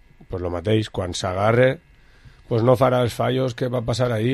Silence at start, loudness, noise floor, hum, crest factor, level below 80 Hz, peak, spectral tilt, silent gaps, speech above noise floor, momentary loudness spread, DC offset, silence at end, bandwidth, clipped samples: 0.2 s; -21 LUFS; -49 dBFS; none; 18 dB; -44 dBFS; -4 dBFS; -6.5 dB/octave; none; 29 dB; 10 LU; under 0.1%; 0 s; 13 kHz; under 0.1%